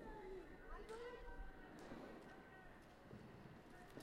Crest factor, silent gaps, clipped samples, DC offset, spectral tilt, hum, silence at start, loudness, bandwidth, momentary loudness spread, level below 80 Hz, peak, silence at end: 16 dB; none; under 0.1%; under 0.1%; -6 dB/octave; none; 0 s; -58 LUFS; 15.5 kHz; 7 LU; -62 dBFS; -40 dBFS; 0 s